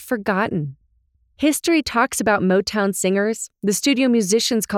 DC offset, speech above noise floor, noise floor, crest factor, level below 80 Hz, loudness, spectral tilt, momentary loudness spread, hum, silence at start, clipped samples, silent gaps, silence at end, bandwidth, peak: under 0.1%; 43 dB; -63 dBFS; 16 dB; -54 dBFS; -19 LUFS; -4 dB/octave; 7 LU; none; 0 s; under 0.1%; none; 0 s; 17 kHz; -4 dBFS